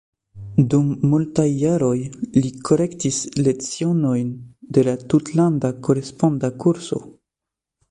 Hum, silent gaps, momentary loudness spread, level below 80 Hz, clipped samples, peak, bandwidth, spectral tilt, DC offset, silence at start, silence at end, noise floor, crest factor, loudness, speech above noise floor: none; none; 6 LU; -52 dBFS; under 0.1%; -4 dBFS; 11 kHz; -7 dB/octave; under 0.1%; 0.35 s; 0.8 s; -86 dBFS; 16 dB; -20 LUFS; 67 dB